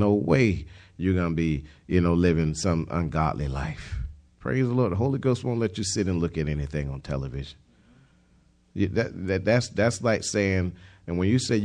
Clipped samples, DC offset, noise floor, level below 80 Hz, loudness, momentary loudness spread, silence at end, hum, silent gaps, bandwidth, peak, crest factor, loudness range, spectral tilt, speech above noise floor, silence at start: under 0.1%; under 0.1%; -61 dBFS; -42 dBFS; -26 LUFS; 13 LU; 0 s; none; none; 10.5 kHz; -8 dBFS; 18 dB; 5 LU; -6 dB/octave; 36 dB; 0 s